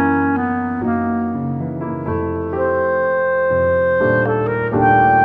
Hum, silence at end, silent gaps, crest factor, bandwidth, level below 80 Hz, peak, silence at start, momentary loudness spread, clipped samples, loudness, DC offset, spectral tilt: none; 0 s; none; 16 dB; 4.2 kHz; -44 dBFS; -2 dBFS; 0 s; 8 LU; under 0.1%; -18 LUFS; under 0.1%; -10.5 dB/octave